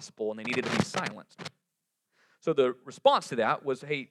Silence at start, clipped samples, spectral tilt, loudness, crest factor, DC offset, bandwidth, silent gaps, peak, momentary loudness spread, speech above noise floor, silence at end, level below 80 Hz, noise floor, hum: 0 s; under 0.1%; -4.5 dB/octave; -29 LUFS; 22 dB; under 0.1%; 13 kHz; none; -8 dBFS; 18 LU; 54 dB; 0.05 s; -70 dBFS; -83 dBFS; none